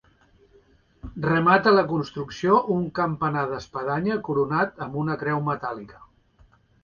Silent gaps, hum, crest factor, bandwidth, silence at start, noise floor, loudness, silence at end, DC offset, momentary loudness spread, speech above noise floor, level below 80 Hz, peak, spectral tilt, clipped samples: none; none; 20 dB; 7 kHz; 1.05 s; -58 dBFS; -24 LUFS; 0.8 s; under 0.1%; 12 LU; 35 dB; -54 dBFS; -4 dBFS; -7.5 dB/octave; under 0.1%